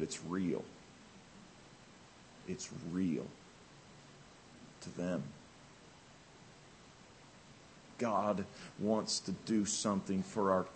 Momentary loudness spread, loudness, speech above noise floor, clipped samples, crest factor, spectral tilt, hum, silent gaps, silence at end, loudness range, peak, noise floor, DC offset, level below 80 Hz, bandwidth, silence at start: 24 LU; -38 LUFS; 23 dB; under 0.1%; 22 dB; -4.5 dB/octave; none; none; 0 s; 11 LU; -18 dBFS; -59 dBFS; under 0.1%; -72 dBFS; 8.4 kHz; 0 s